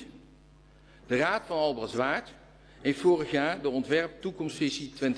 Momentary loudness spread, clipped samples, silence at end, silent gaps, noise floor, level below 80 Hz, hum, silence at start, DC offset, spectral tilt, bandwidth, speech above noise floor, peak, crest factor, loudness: 9 LU; under 0.1%; 0 s; none; -56 dBFS; -60 dBFS; none; 0 s; under 0.1%; -5 dB/octave; 11 kHz; 28 dB; -12 dBFS; 18 dB; -29 LUFS